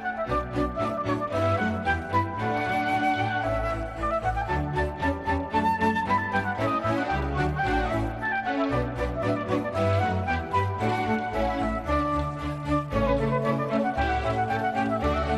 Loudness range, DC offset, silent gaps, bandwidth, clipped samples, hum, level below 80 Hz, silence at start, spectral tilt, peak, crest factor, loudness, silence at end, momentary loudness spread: 1 LU; under 0.1%; none; 13 kHz; under 0.1%; none; -38 dBFS; 0 s; -7 dB/octave; -12 dBFS; 14 dB; -26 LUFS; 0 s; 4 LU